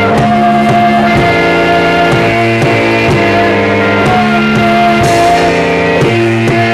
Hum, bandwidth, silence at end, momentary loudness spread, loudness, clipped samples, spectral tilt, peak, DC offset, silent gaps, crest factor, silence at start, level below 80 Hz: none; 14.5 kHz; 0 s; 1 LU; -8 LUFS; under 0.1%; -6 dB/octave; -2 dBFS; under 0.1%; none; 6 dB; 0 s; -32 dBFS